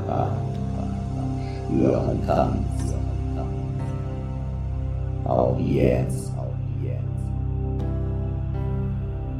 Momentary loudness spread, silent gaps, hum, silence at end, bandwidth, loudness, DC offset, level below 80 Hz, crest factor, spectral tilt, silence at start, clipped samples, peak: 8 LU; none; 50 Hz at -50 dBFS; 0 s; 11 kHz; -26 LUFS; under 0.1%; -32 dBFS; 20 dB; -8.5 dB/octave; 0 s; under 0.1%; -4 dBFS